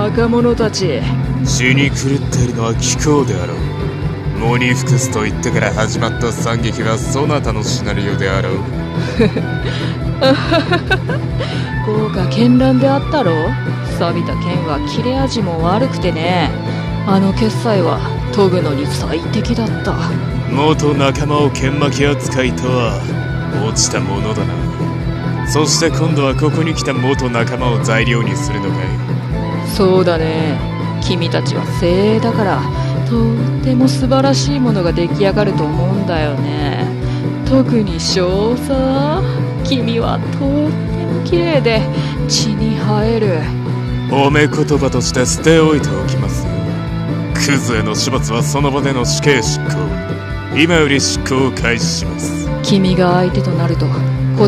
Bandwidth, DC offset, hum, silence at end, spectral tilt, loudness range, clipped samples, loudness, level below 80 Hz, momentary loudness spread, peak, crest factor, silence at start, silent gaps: 14 kHz; under 0.1%; none; 0 s; -5.5 dB/octave; 2 LU; under 0.1%; -15 LUFS; -28 dBFS; 7 LU; 0 dBFS; 14 dB; 0 s; none